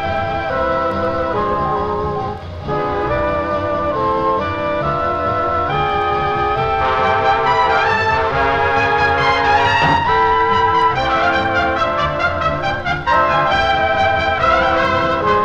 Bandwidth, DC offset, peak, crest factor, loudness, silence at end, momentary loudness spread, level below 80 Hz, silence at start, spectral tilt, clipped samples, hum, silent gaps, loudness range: 9.2 kHz; under 0.1%; -2 dBFS; 14 dB; -16 LUFS; 0 s; 6 LU; -34 dBFS; 0 s; -5.5 dB/octave; under 0.1%; none; none; 5 LU